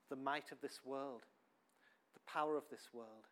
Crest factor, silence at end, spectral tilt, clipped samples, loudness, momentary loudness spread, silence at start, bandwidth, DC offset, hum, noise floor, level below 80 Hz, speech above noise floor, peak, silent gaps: 22 dB; 0.1 s; -4 dB/octave; under 0.1%; -46 LUFS; 15 LU; 0.1 s; 17 kHz; under 0.1%; none; -77 dBFS; under -90 dBFS; 30 dB; -26 dBFS; none